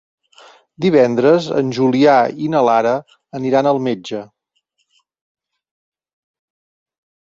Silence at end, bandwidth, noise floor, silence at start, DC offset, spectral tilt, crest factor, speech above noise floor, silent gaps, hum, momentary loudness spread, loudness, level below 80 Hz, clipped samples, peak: 3.15 s; 7.6 kHz; -68 dBFS; 0.8 s; under 0.1%; -6.5 dB/octave; 16 dB; 54 dB; none; none; 12 LU; -15 LUFS; -62 dBFS; under 0.1%; 0 dBFS